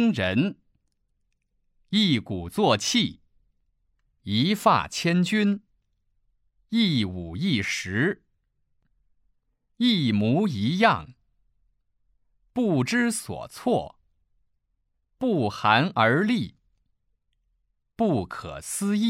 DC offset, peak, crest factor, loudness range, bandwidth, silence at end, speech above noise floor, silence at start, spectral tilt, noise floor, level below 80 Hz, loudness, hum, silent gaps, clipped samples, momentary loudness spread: under 0.1%; -4 dBFS; 22 dB; 3 LU; 15.5 kHz; 0 s; 51 dB; 0 s; -5 dB/octave; -74 dBFS; -58 dBFS; -24 LUFS; none; none; under 0.1%; 10 LU